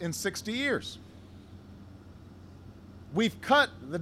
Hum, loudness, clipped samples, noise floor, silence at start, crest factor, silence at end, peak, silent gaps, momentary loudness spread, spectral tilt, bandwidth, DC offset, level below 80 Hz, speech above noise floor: none; -29 LUFS; under 0.1%; -50 dBFS; 0 s; 22 dB; 0 s; -10 dBFS; none; 26 LU; -4 dB/octave; 15.5 kHz; under 0.1%; -62 dBFS; 20 dB